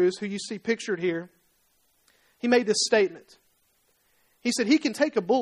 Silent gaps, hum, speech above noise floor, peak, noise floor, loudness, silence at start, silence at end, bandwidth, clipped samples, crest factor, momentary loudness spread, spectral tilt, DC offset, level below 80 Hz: none; none; 43 dB; -8 dBFS; -68 dBFS; -25 LUFS; 0 s; 0 s; 14 kHz; under 0.1%; 18 dB; 10 LU; -3.5 dB/octave; under 0.1%; -74 dBFS